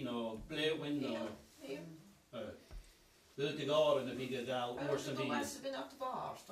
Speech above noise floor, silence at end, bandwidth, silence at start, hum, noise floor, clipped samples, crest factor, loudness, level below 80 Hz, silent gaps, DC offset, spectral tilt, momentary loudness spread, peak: 27 dB; 0 s; 15 kHz; 0 s; none; -66 dBFS; under 0.1%; 18 dB; -39 LUFS; -66 dBFS; none; under 0.1%; -4.5 dB/octave; 19 LU; -22 dBFS